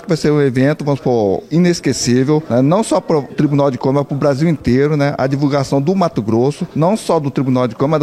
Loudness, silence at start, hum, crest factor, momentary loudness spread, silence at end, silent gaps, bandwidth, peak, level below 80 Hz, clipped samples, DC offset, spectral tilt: -15 LUFS; 0 s; none; 12 dB; 3 LU; 0 s; none; 13.5 kHz; -2 dBFS; -44 dBFS; under 0.1%; under 0.1%; -6.5 dB/octave